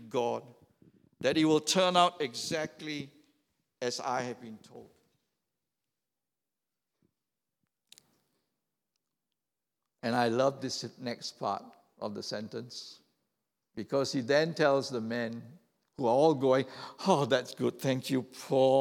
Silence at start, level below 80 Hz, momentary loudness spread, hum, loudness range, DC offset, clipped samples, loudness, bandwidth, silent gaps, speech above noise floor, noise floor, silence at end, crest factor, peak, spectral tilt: 0 s; -80 dBFS; 15 LU; none; 11 LU; under 0.1%; under 0.1%; -31 LUFS; 17 kHz; none; over 60 dB; under -90 dBFS; 0 s; 22 dB; -10 dBFS; -4.5 dB/octave